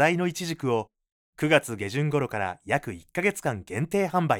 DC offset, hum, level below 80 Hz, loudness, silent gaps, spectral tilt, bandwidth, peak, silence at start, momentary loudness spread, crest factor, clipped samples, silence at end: under 0.1%; none; -62 dBFS; -27 LUFS; 1.12-1.33 s; -5.5 dB/octave; 18.5 kHz; -6 dBFS; 0 s; 8 LU; 20 dB; under 0.1%; 0 s